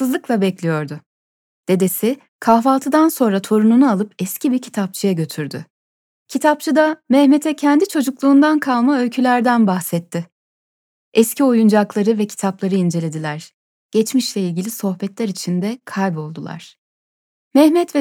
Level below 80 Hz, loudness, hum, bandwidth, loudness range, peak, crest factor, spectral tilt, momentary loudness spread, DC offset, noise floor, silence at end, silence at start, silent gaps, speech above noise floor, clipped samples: -74 dBFS; -17 LUFS; none; 18 kHz; 7 LU; 0 dBFS; 16 dB; -5.5 dB/octave; 14 LU; under 0.1%; under -90 dBFS; 0 s; 0 s; 1.06-1.64 s, 2.29-2.39 s, 5.70-6.26 s, 10.32-11.12 s, 13.54-13.90 s, 16.78-17.51 s; over 74 dB; under 0.1%